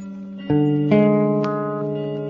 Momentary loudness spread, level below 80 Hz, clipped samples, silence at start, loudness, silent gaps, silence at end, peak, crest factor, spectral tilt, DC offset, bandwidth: 11 LU; -58 dBFS; under 0.1%; 0 s; -19 LUFS; none; 0 s; -6 dBFS; 14 dB; -10 dB/octave; under 0.1%; 6.6 kHz